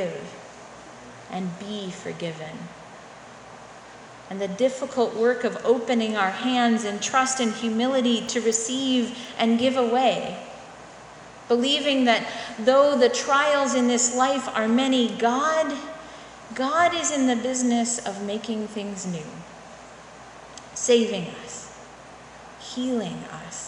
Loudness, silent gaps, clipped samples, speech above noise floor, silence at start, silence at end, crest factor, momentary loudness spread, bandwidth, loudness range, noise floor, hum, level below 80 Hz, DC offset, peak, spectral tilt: -23 LUFS; none; under 0.1%; 21 dB; 0 s; 0 s; 20 dB; 23 LU; 11 kHz; 11 LU; -44 dBFS; none; -64 dBFS; under 0.1%; -4 dBFS; -3 dB/octave